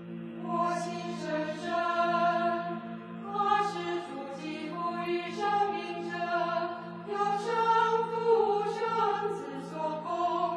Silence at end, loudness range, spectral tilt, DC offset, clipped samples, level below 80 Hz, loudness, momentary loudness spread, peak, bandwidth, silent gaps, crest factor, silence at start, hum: 0 s; 4 LU; -5.5 dB/octave; under 0.1%; under 0.1%; -80 dBFS; -31 LUFS; 11 LU; -14 dBFS; 11 kHz; none; 16 dB; 0 s; none